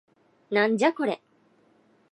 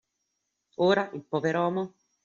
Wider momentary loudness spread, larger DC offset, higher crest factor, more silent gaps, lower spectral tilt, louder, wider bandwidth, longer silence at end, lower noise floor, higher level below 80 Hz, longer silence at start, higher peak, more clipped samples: second, 9 LU vs 12 LU; neither; about the same, 20 dB vs 20 dB; neither; about the same, -5 dB/octave vs -4.5 dB/octave; about the same, -25 LUFS vs -27 LUFS; first, 11 kHz vs 7.4 kHz; first, 0.95 s vs 0.35 s; second, -63 dBFS vs -80 dBFS; second, -80 dBFS vs -72 dBFS; second, 0.5 s vs 0.8 s; about the same, -8 dBFS vs -10 dBFS; neither